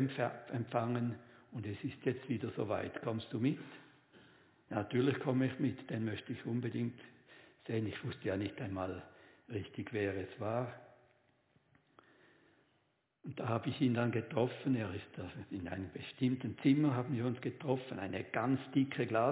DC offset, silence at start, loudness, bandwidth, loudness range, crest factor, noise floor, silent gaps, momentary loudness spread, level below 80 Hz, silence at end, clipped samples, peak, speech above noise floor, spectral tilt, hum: under 0.1%; 0 s; -38 LUFS; 4 kHz; 7 LU; 20 dB; -78 dBFS; none; 12 LU; -66 dBFS; 0 s; under 0.1%; -18 dBFS; 41 dB; -6.5 dB/octave; none